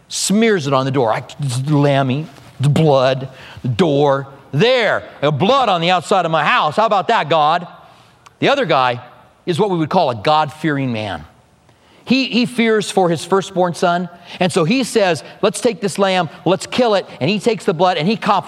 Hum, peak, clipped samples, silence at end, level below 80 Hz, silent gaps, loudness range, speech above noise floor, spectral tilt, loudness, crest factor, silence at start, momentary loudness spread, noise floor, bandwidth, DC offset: none; 0 dBFS; under 0.1%; 0 s; -58 dBFS; none; 3 LU; 35 dB; -5 dB/octave; -16 LUFS; 16 dB; 0.1 s; 8 LU; -51 dBFS; 14.5 kHz; under 0.1%